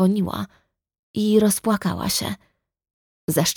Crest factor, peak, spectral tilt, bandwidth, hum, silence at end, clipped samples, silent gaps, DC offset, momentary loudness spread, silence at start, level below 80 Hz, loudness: 18 dB; -4 dBFS; -4.5 dB/octave; 19.5 kHz; none; 0.05 s; under 0.1%; 0.99-1.14 s, 2.93-3.28 s; under 0.1%; 15 LU; 0 s; -52 dBFS; -22 LUFS